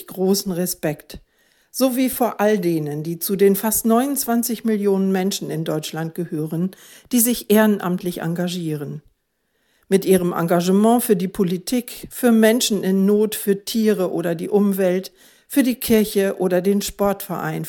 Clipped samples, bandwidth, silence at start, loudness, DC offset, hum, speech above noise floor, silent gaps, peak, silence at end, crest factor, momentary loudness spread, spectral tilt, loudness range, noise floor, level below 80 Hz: under 0.1%; 17.5 kHz; 0 s; -19 LUFS; under 0.1%; none; 51 dB; none; 0 dBFS; 0 s; 18 dB; 10 LU; -5 dB/octave; 3 LU; -70 dBFS; -54 dBFS